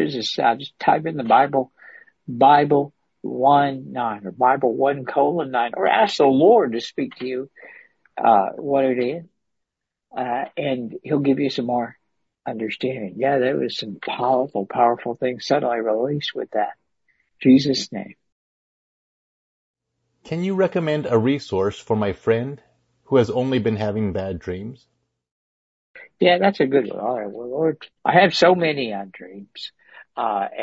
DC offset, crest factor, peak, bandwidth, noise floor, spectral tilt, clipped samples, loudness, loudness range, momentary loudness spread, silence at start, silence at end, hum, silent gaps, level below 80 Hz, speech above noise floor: under 0.1%; 20 dB; -2 dBFS; 8 kHz; -82 dBFS; -6 dB/octave; under 0.1%; -20 LUFS; 6 LU; 16 LU; 0 s; 0 s; none; 18.32-19.74 s, 25.31-25.94 s; -60 dBFS; 62 dB